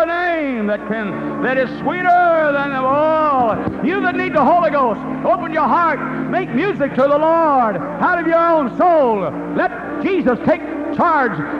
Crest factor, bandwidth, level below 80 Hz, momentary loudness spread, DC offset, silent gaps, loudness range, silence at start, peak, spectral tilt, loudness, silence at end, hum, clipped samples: 12 dB; 7 kHz; -48 dBFS; 7 LU; under 0.1%; none; 1 LU; 0 s; -4 dBFS; -8 dB/octave; -16 LUFS; 0 s; none; under 0.1%